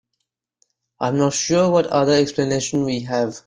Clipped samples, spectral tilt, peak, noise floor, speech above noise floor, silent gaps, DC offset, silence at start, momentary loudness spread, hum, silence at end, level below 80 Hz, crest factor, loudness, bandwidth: under 0.1%; -5 dB/octave; -4 dBFS; -77 dBFS; 59 dB; none; under 0.1%; 1 s; 6 LU; none; 0.05 s; -56 dBFS; 16 dB; -19 LUFS; 10 kHz